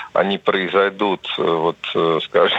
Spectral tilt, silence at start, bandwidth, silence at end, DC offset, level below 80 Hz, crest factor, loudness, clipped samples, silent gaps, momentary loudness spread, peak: -6 dB/octave; 0 s; 8 kHz; 0 s; under 0.1%; -62 dBFS; 16 dB; -19 LUFS; under 0.1%; none; 4 LU; -2 dBFS